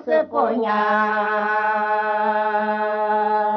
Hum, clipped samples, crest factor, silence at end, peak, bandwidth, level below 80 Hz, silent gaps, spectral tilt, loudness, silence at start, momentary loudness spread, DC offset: none; under 0.1%; 12 dB; 0 s; -6 dBFS; 6 kHz; -76 dBFS; none; -2.5 dB/octave; -20 LUFS; 0 s; 2 LU; under 0.1%